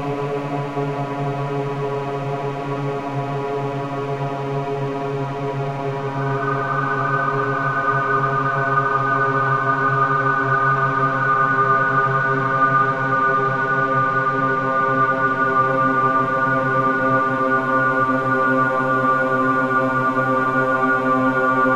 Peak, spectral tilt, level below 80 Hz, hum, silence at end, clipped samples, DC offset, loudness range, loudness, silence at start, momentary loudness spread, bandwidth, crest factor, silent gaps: -6 dBFS; -7.5 dB/octave; -54 dBFS; none; 0 s; under 0.1%; under 0.1%; 7 LU; -19 LUFS; 0 s; 7 LU; 9.4 kHz; 14 dB; none